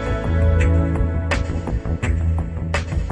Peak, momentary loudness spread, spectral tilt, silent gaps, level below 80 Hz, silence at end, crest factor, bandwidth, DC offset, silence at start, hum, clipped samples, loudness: -6 dBFS; 7 LU; -7 dB/octave; none; -24 dBFS; 0 s; 14 dB; 8.8 kHz; under 0.1%; 0 s; none; under 0.1%; -21 LUFS